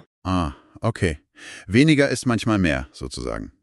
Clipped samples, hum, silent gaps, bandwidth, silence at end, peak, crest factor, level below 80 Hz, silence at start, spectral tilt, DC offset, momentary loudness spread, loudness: under 0.1%; none; none; 12 kHz; 0.1 s; -4 dBFS; 20 dB; -40 dBFS; 0.25 s; -6 dB/octave; under 0.1%; 16 LU; -22 LUFS